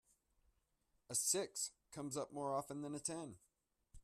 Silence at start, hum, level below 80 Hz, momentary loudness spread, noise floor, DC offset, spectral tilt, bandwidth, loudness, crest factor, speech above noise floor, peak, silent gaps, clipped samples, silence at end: 1.1 s; none; -74 dBFS; 12 LU; -83 dBFS; under 0.1%; -3 dB/octave; 15.5 kHz; -42 LUFS; 22 dB; 39 dB; -24 dBFS; none; under 0.1%; 0.05 s